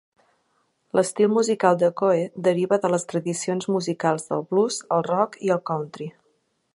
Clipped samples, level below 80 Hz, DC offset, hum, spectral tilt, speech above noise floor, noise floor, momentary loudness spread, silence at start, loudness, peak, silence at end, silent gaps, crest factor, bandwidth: under 0.1%; -72 dBFS; under 0.1%; none; -5.5 dB/octave; 47 dB; -69 dBFS; 7 LU; 0.95 s; -23 LUFS; -4 dBFS; 0.65 s; none; 20 dB; 11.5 kHz